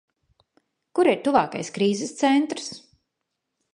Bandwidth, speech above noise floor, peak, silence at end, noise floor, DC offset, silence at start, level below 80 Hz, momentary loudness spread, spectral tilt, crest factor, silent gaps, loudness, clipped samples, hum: 11 kHz; 59 dB; -4 dBFS; 0.95 s; -81 dBFS; under 0.1%; 0.95 s; -68 dBFS; 12 LU; -4.5 dB/octave; 22 dB; none; -23 LUFS; under 0.1%; none